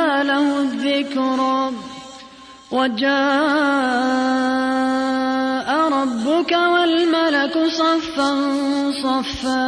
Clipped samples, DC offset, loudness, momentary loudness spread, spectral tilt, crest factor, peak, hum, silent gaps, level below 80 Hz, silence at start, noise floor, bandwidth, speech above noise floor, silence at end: under 0.1%; under 0.1%; -18 LUFS; 5 LU; -3.5 dB/octave; 12 dB; -6 dBFS; none; none; -54 dBFS; 0 s; -42 dBFS; 10.5 kHz; 24 dB; 0 s